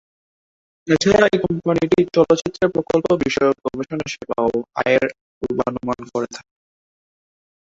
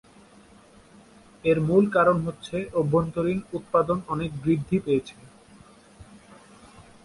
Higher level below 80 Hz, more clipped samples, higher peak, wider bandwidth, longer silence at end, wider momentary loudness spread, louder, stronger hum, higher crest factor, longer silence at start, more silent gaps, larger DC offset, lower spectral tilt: about the same, -50 dBFS vs -54 dBFS; neither; first, -2 dBFS vs -8 dBFS; second, 7.8 kHz vs 11.5 kHz; first, 1.3 s vs 0.85 s; about the same, 11 LU vs 10 LU; first, -19 LUFS vs -24 LUFS; neither; about the same, 18 dB vs 18 dB; second, 0.85 s vs 1.45 s; first, 5.21-5.41 s vs none; neither; second, -5.5 dB/octave vs -8 dB/octave